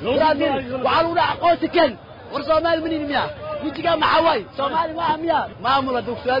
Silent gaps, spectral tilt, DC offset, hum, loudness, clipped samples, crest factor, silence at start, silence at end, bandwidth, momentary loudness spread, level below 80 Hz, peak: none; -7 dB/octave; under 0.1%; none; -20 LUFS; under 0.1%; 14 dB; 0 s; 0 s; 5.4 kHz; 7 LU; -50 dBFS; -6 dBFS